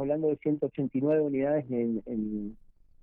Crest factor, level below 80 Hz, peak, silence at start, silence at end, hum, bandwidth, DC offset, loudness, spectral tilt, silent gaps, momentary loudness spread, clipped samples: 12 dB; -58 dBFS; -16 dBFS; 0 s; 0.45 s; none; 3.6 kHz; under 0.1%; -30 LUFS; -9.5 dB/octave; none; 8 LU; under 0.1%